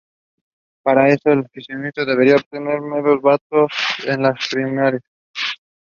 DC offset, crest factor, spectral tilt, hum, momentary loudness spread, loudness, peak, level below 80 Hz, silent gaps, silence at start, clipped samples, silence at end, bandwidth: under 0.1%; 18 dB; -6 dB/octave; none; 10 LU; -17 LUFS; 0 dBFS; -62 dBFS; 2.46-2.51 s, 3.41-3.50 s, 5.08-5.34 s; 0.85 s; under 0.1%; 0.3 s; 7.2 kHz